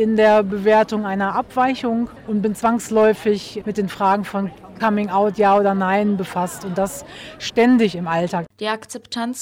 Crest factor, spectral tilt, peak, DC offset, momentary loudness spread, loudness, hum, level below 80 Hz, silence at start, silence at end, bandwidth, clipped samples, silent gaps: 14 dB; -5.5 dB/octave; -6 dBFS; under 0.1%; 11 LU; -19 LUFS; none; -54 dBFS; 0 s; 0 s; 16.5 kHz; under 0.1%; none